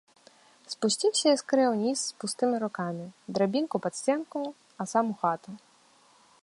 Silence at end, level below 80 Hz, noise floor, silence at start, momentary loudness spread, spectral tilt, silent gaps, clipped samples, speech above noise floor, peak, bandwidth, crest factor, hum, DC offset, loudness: 0.85 s; -78 dBFS; -61 dBFS; 0.7 s; 14 LU; -4 dB/octave; none; under 0.1%; 33 dB; -10 dBFS; 11.5 kHz; 18 dB; none; under 0.1%; -28 LUFS